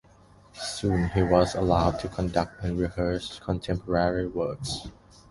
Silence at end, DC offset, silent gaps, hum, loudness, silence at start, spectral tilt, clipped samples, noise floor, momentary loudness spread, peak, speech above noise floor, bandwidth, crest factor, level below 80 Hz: 0.4 s; under 0.1%; none; none; -27 LUFS; 0.55 s; -6 dB/octave; under 0.1%; -55 dBFS; 11 LU; -6 dBFS; 29 dB; 11.5 kHz; 22 dB; -40 dBFS